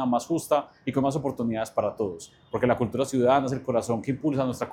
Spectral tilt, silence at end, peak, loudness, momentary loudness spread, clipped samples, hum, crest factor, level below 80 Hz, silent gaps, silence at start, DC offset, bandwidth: -6.5 dB/octave; 0 s; -8 dBFS; -26 LUFS; 7 LU; under 0.1%; none; 18 dB; -58 dBFS; none; 0 s; under 0.1%; 16.5 kHz